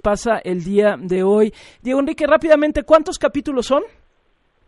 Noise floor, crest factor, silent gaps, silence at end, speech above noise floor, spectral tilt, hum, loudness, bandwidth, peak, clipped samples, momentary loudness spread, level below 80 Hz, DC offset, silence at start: -61 dBFS; 16 dB; none; 0.8 s; 45 dB; -5.5 dB/octave; none; -17 LUFS; 11.5 kHz; -2 dBFS; under 0.1%; 7 LU; -42 dBFS; under 0.1%; 0.05 s